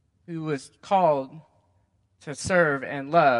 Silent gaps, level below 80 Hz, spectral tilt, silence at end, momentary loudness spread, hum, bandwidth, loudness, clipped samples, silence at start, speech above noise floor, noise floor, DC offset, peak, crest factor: none; -62 dBFS; -5.5 dB/octave; 0 s; 17 LU; none; 11.5 kHz; -25 LUFS; under 0.1%; 0.3 s; 43 dB; -67 dBFS; under 0.1%; -6 dBFS; 20 dB